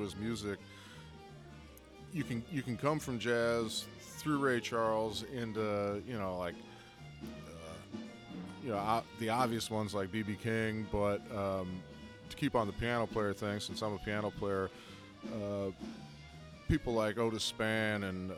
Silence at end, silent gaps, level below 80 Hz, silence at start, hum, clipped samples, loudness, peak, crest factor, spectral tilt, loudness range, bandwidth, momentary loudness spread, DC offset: 0 s; none; -58 dBFS; 0 s; none; under 0.1%; -36 LUFS; -18 dBFS; 20 dB; -5.5 dB/octave; 5 LU; 17 kHz; 18 LU; under 0.1%